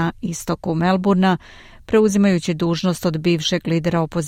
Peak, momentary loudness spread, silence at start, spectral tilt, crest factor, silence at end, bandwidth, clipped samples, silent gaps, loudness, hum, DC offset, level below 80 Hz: -4 dBFS; 8 LU; 0 s; -6 dB/octave; 14 dB; 0 s; 15.5 kHz; under 0.1%; none; -19 LUFS; none; under 0.1%; -46 dBFS